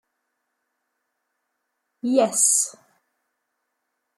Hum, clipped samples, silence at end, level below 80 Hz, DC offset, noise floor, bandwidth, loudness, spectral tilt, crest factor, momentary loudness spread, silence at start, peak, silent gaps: none; under 0.1%; 1.45 s; -82 dBFS; under 0.1%; -78 dBFS; 13 kHz; -19 LUFS; -2 dB/octave; 22 dB; 11 LU; 2.05 s; -6 dBFS; none